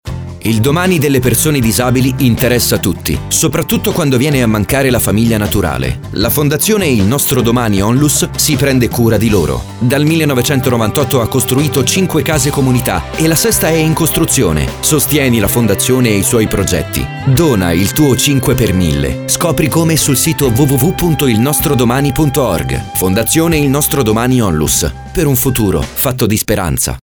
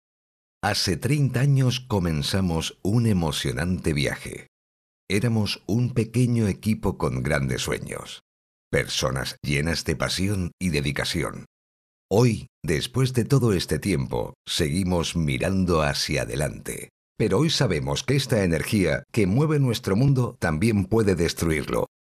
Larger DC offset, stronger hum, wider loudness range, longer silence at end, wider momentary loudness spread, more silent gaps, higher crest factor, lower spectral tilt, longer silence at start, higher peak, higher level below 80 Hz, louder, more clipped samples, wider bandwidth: neither; neither; second, 1 LU vs 4 LU; second, 0.05 s vs 0.25 s; second, 4 LU vs 7 LU; second, none vs 4.48-5.07 s, 8.21-8.71 s, 10.53-10.58 s, 11.46-12.09 s, 12.49-12.62 s, 14.35-14.45 s, 16.90-17.16 s; about the same, 12 dB vs 16 dB; about the same, -4.5 dB/octave vs -5.5 dB/octave; second, 0.05 s vs 0.65 s; first, 0 dBFS vs -8 dBFS; first, -28 dBFS vs -40 dBFS; first, -11 LUFS vs -24 LUFS; neither; first, over 20 kHz vs 15 kHz